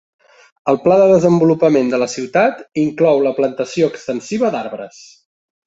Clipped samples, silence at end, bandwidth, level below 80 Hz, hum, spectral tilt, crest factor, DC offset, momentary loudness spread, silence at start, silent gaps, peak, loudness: under 0.1%; 0.8 s; 8 kHz; -58 dBFS; none; -6.5 dB/octave; 14 dB; under 0.1%; 13 LU; 0.65 s; none; -2 dBFS; -15 LUFS